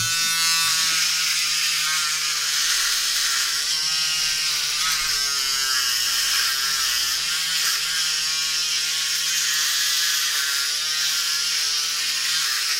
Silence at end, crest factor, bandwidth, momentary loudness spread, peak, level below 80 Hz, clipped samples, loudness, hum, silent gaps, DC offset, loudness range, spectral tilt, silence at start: 0 s; 14 dB; 16 kHz; 2 LU; -8 dBFS; -56 dBFS; under 0.1%; -19 LUFS; none; none; under 0.1%; 1 LU; 3 dB/octave; 0 s